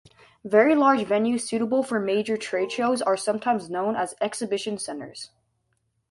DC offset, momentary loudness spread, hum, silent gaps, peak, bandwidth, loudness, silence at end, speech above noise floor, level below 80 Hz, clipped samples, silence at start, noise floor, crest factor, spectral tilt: under 0.1%; 14 LU; none; none; -6 dBFS; 11.5 kHz; -24 LUFS; 0.85 s; 49 dB; -70 dBFS; under 0.1%; 0.45 s; -73 dBFS; 20 dB; -4 dB/octave